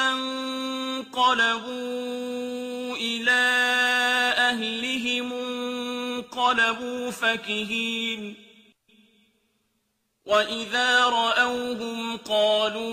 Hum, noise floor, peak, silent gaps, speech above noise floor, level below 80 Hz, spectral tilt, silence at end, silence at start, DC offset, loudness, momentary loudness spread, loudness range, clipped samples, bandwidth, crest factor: none; -74 dBFS; -8 dBFS; none; 50 dB; -68 dBFS; -2 dB/octave; 0 s; 0 s; under 0.1%; -24 LUFS; 11 LU; 7 LU; under 0.1%; 15.5 kHz; 18 dB